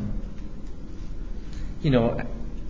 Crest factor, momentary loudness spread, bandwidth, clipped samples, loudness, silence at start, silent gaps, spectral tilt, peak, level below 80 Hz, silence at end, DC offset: 22 dB; 18 LU; 7.6 kHz; under 0.1%; -28 LUFS; 0 s; none; -8.5 dB/octave; -6 dBFS; -34 dBFS; 0 s; 1%